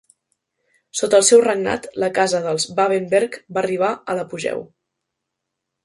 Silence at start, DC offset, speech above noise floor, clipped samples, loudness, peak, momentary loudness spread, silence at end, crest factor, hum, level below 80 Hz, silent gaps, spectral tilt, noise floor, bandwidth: 0.95 s; under 0.1%; 62 dB; under 0.1%; -19 LUFS; -2 dBFS; 13 LU; 1.2 s; 20 dB; none; -62 dBFS; none; -3 dB/octave; -80 dBFS; 11.5 kHz